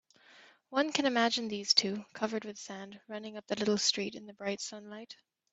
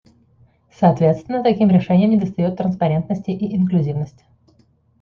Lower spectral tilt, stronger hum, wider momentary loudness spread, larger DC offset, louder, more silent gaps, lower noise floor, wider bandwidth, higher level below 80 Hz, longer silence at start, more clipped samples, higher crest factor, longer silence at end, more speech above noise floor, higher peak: second, -2.5 dB/octave vs -10 dB/octave; neither; first, 18 LU vs 9 LU; neither; second, -32 LUFS vs -18 LUFS; neither; about the same, -60 dBFS vs -57 dBFS; first, 8.4 kHz vs 6.2 kHz; second, -78 dBFS vs -54 dBFS; second, 0.35 s vs 0.8 s; neither; first, 24 dB vs 16 dB; second, 0.4 s vs 0.9 s; second, 26 dB vs 40 dB; second, -10 dBFS vs -2 dBFS